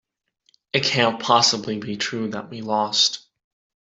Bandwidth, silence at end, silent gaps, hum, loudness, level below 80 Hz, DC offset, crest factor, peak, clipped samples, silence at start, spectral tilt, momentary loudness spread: 8.2 kHz; 0.65 s; none; none; -20 LUFS; -66 dBFS; under 0.1%; 20 dB; -2 dBFS; under 0.1%; 0.75 s; -2.5 dB/octave; 12 LU